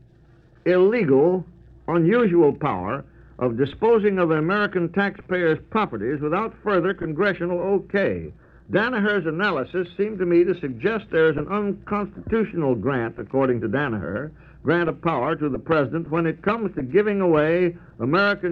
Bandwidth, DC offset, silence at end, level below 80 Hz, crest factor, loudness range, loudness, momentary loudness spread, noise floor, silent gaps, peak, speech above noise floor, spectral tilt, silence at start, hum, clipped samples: 5.4 kHz; under 0.1%; 0 s; -50 dBFS; 16 dB; 3 LU; -22 LUFS; 9 LU; -53 dBFS; none; -6 dBFS; 31 dB; -9 dB/octave; 0.65 s; none; under 0.1%